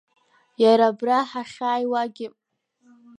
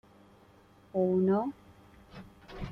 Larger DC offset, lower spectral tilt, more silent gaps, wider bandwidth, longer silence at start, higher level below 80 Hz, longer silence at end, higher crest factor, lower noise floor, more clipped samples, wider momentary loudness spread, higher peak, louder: neither; second, -5 dB/octave vs -9.5 dB/octave; neither; first, 10.5 kHz vs 5.8 kHz; second, 0.6 s vs 0.95 s; second, -78 dBFS vs -56 dBFS; first, 0.9 s vs 0 s; about the same, 18 dB vs 16 dB; about the same, -62 dBFS vs -60 dBFS; neither; second, 14 LU vs 25 LU; first, -4 dBFS vs -18 dBFS; first, -22 LUFS vs -30 LUFS